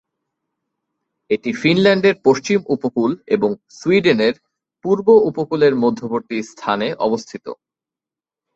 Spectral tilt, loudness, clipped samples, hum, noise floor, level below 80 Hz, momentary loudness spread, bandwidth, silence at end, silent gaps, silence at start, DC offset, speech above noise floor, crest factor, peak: -6 dB/octave; -17 LUFS; under 0.1%; none; -89 dBFS; -60 dBFS; 11 LU; 8 kHz; 1 s; none; 1.3 s; under 0.1%; 72 dB; 16 dB; -2 dBFS